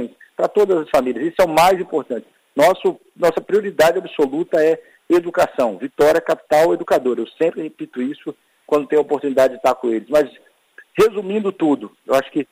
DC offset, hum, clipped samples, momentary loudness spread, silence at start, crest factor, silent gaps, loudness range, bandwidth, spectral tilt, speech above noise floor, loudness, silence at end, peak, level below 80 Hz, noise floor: under 0.1%; none; under 0.1%; 10 LU; 0 s; 16 dB; none; 2 LU; 16 kHz; -5 dB/octave; 31 dB; -18 LUFS; 0.1 s; -2 dBFS; -54 dBFS; -49 dBFS